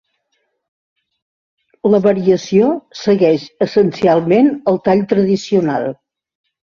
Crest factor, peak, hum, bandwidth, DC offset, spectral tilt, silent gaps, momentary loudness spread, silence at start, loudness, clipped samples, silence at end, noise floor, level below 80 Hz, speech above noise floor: 16 dB; 0 dBFS; none; 7.4 kHz; under 0.1%; -7 dB/octave; none; 6 LU; 1.85 s; -14 LUFS; under 0.1%; 0.7 s; -68 dBFS; -56 dBFS; 55 dB